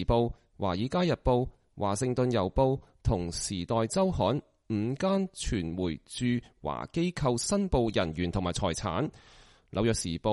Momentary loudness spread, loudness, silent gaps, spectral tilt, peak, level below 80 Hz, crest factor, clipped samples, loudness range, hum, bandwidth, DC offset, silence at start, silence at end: 7 LU; -30 LUFS; none; -5.5 dB/octave; -12 dBFS; -44 dBFS; 16 dB; under 0.1%; 2 LU; none; 11.5 kHz; under 0.1%; 0 s; 0 s